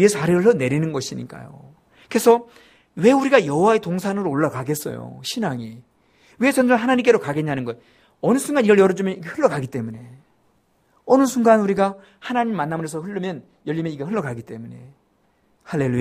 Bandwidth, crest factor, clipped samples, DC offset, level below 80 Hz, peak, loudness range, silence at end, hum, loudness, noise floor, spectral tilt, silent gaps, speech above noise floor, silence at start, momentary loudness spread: 15.5 kHz; 20 dB; under 0.1%; under 0.1%; -60 dBFS; -2 dBFS; 6 LU; 0 s; none; -20 LUFS; -63 dBFS; -6 dB/octave; none; 43 dB; 0 s; 17 LU